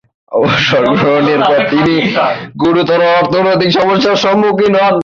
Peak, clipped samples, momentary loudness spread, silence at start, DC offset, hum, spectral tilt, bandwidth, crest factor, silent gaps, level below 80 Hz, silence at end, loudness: 0 dBFS; under 0.1%; 4 LU; 0.3 s; under 0.1%; none; -6 dB/octave; 7.4 kHz; 10 dB; none; -46 dBFS; 0 s; -10 LUFS